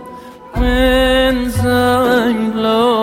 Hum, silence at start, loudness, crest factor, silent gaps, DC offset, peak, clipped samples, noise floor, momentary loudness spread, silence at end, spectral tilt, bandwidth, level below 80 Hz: none; 0 s; -14 LUFS; 12 dB; none; under 0.1%; -2 dBFS; under 0.1%; -33 dBFS; 10 LU; 0 s; -5.5 dB/octave; 16.5 kHz; -24 dBFS